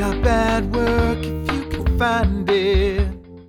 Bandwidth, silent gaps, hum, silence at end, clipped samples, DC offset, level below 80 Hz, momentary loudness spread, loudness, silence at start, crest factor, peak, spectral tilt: 15.5 kHz; none; none; 0.05 s; under 0.1%; under 0.1%; -24 dBFS; 6 LU; -20 LUFS; 0 s; 14 dB; -4 dBFS; -6.5 dB/octave